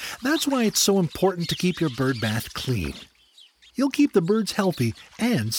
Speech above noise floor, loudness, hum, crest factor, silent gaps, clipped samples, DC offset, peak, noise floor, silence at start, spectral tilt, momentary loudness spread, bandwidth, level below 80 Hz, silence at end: 32 dB; -23 LUFS; none; 16 dB; none; under 0.1%; under 0.1%; -8 dBFS; -55 dBFS; 0 s; -4.5 dB/octave; 8 LU; over 20 kHz; -50 dBFS; 0 s